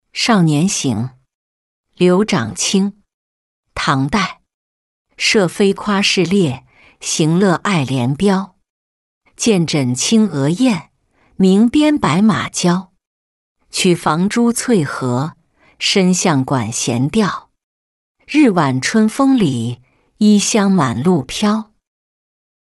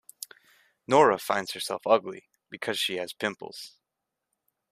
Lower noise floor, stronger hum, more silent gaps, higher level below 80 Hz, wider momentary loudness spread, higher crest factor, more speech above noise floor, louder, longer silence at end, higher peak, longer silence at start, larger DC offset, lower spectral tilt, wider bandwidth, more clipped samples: second, -57 dBFS vs -85 dBFS; neither; first, 1.34-1.84 s, 3.14-3.63 s, 4.54-5.05 s, 8.70-9.21 s, 13.07-13.55 s, 17.63-18.15 s vs none; first, -50 dBFS vs -72 dBFS; second, 8 LU vs 22 LU; second, 14 dB vs 22 dB; second, 43 dB vs 59 dB; first, -15 LUFS vs -26 LUFS; about the same, 1.1 s vs 1.05 s; first, -2 dBFS vs -6 dBFS; second, 0.15 s vs 0.9 s; neither; first, -5 dB/octave vs -3.5 dB/octave; second, 12 kHz vs 15.5 kHz; neither